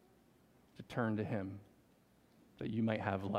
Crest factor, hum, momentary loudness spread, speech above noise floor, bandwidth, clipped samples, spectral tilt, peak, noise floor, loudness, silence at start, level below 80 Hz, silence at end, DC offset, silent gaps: 22 dB; none; 14 LU; 31 dB; 11.5 kHz; under 0.1%; -8 dB/octave; -20 dBFS; -69 dBFS; -39 LUFS; 0.8 s; -74 dBFS; 0 s; under 0.1%; none